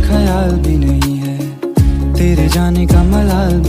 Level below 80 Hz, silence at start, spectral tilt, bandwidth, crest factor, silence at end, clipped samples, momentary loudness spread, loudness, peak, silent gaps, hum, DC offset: -14 dBFS; 0 s; -7 dB/octave; 15.5 kHz; 10 dB; 0 s; under 0.1%; 6 LU; -13 LUFS; 0 dBFS; none; none; under 0.1%